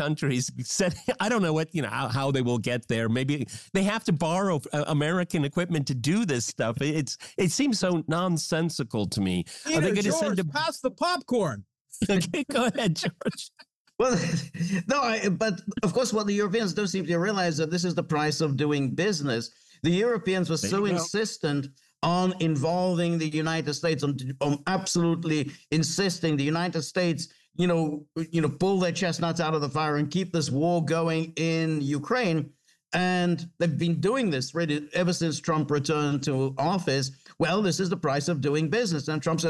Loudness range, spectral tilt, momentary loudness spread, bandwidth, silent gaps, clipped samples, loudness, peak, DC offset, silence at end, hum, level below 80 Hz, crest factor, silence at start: 1 LU; -5 dB/octave; 5 LU; 12.5 kHz; 11.81-11.85 s, 13.75-13.85 s; under 0.1%; -27 LUFS; -16 dBFS; under 0.1%; 0 s; none; -62 dBFS; 12 dB; 0 s